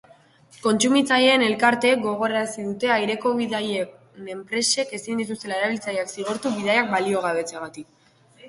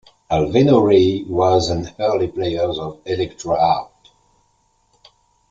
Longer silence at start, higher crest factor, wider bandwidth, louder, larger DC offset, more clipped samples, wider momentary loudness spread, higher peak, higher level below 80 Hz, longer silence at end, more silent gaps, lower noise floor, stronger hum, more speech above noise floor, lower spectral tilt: first, 0.65 s vs 0.3 s; about the same, 20 dB vs 18 dB; first, 11.5 kHz vs 7.8 kHz; second, -22 LUFS vs -18 LUFS; neither; neither; first, 13 LU vs 10 LU; about the same, -4 dBFS vs -2 dBFS; second, -68 dBFS vs -46 dBFS; second, 0 s vs 1.65 s; neither; second, -53 dBFS vs -62 dBFS; second, none vs 50 Hz at -55 dBFS; second, 31 dB vs 45 dB; second, -3 dB/octave vs -6.5 dB/octave